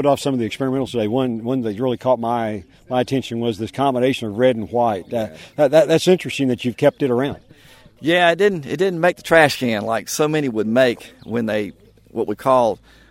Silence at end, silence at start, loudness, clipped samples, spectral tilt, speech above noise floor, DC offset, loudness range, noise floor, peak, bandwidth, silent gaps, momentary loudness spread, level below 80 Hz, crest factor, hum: 0.35 s; 0 s; -19 LUFS; under 0.1%; -5.5 dB/octave; 28 dB; under 0.1%; 4 LU; -47 dBFS; 0 dBFS; 16 kHz; none; 11 LU; -54 dBFS; 18 dB; none